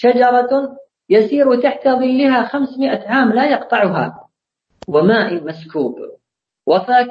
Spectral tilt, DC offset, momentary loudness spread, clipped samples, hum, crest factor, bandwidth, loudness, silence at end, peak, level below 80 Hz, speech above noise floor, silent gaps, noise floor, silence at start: -8 dB/octave; under 0.1%; 12 LU; under 0.1%; none; 14 dB; 7.2 kHz; -15 LUFS; 0 s; -2 dBFS; -62 dBFS; 54 dB; none; -68 dBFS; 0 s